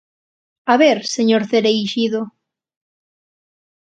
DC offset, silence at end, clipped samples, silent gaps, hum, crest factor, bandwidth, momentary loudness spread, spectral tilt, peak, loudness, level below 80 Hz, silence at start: under 0.1%; 1.5 s; under 0.1%; none; none; 20 dB; 9.2 kHz; 12 LU; -4 dB/octave; 0 dBFS; -16 LUFS; -68 dBFS; 0.65 s